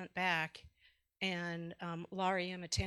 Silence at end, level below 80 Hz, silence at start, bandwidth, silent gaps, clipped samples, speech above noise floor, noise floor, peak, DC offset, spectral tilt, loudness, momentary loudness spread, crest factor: 0 s; -60 dBFS; 0 s; 13 kHz; none; under 0.1%; 34 dB; -72 dBFS; -20 dBFS; under 0.1%; -4 dB/octave; -38 LUFS; 9 LU; 20 dB